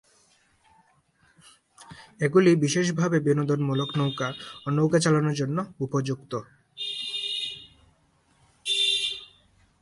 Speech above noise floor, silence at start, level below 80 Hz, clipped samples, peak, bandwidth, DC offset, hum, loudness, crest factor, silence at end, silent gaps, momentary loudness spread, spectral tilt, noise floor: 41 dB; 1.8 s; -66 dBFS; under 0.1%; -8 dBFS; 11.5 kHz; under 0.1%; none; -25 LUFS; 20 dB; 0.55 s; none; 15 LU; -5 dB/octave; -64 dBFS